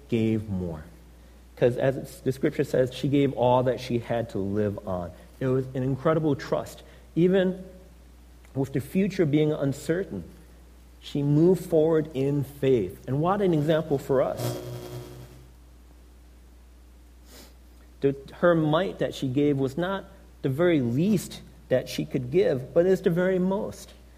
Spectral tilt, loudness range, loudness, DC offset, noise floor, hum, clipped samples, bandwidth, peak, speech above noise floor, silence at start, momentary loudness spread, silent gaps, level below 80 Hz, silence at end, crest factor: -7.5 dB/octave; 4 LU; -26 LUFS; under 0.1%; -50 dBFS; none; under 0.1%; 15.5 kHz; -8 dBFS; 26 dB; 0.05 s; 14 LU; none; -50 dBFS; 0.25 s; 18 dB